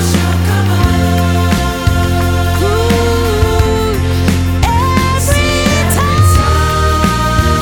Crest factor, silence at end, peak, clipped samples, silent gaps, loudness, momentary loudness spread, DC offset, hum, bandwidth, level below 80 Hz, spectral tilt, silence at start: 10 dB; 0 s; 0 dBFS; under 0.1%; none; -12 LUFS; 3 LU; under 0.1%; none; 18.5 kHz; -18 dBFS; -5.5 dB/octave; 0 s